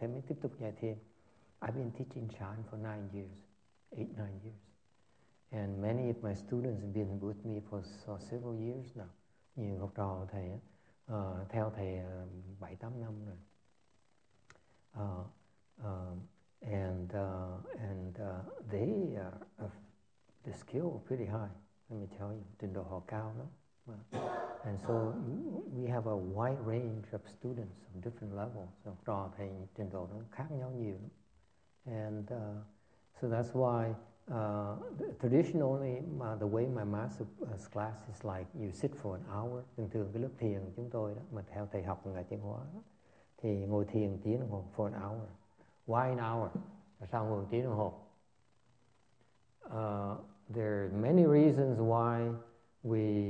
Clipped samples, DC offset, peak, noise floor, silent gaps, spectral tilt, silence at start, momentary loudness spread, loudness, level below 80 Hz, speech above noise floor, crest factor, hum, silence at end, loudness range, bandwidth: under 0.1%; under 0.1%; -16 dBFS; -75 dBFS; none; -9.5 dB/octave; 0 s; 15 LU; -39 LUFS; -70 dBFS; 38 dB; 24 dB; none; 0 s; 9 LU; 9 kHz